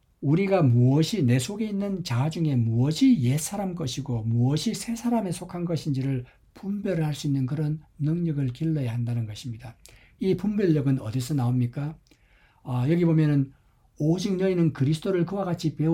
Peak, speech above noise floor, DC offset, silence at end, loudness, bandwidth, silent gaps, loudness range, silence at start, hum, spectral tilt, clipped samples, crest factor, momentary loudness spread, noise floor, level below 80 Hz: -10 dBFS; 35 dB; under 0.1%; 0 s; -25 LUFS; 16 kHz; none; 5 LU; 0.2 s; none; -7 dB/octave; under 0.1%; 14 dB; 10 LU; -60 dBFS; -56 dBFS